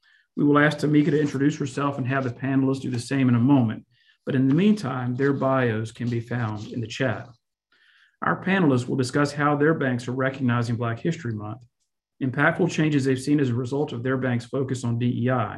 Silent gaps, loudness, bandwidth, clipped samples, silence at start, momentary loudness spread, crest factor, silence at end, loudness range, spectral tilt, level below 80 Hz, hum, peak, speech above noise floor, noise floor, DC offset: none; -24 LUFS; 11.5 kHz; under 0.1%; 0.35 s; 9 LU; 20 dB; 0 s; 4 LU; -7 dB/octave; -60 dBFS; none; -4 dBFS; 43 dB; -66 dBFS; under 0.1%